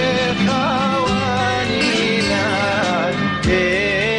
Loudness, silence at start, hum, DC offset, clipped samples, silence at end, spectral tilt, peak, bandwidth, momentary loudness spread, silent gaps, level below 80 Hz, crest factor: -17 LUFS; 0 s; none; under 0.1%; under 0.1%; 0 s; -4.5 dB/octave; -4 dBFS; 10.5 kHz; 2 LU; none; -38 dBFS; 12 dB